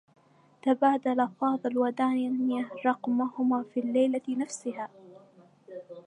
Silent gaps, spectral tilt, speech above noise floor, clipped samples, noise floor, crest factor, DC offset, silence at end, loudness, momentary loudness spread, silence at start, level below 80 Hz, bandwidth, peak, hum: none; -5 dB/octave; 30 dB; under 0.1%; -58 dBFS; 18 dB; under 0.1%; 0.05 s; -28 LUFS; 12 LU; 0.65 s; -86 dBFS; 10.5 kHz; -12 dBFS; none